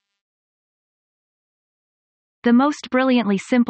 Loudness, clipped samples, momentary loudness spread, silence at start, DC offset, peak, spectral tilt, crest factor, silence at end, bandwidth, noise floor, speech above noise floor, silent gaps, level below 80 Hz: -19 LUFS; under 0.1%; 4 LU; 2.45 s; under 0.1%; -4 dBFS; -6 dB/octave; 18 dB; 0 s; 8.6 kHz; under -90 dBFS; over 73 dB; none; -68 dBFS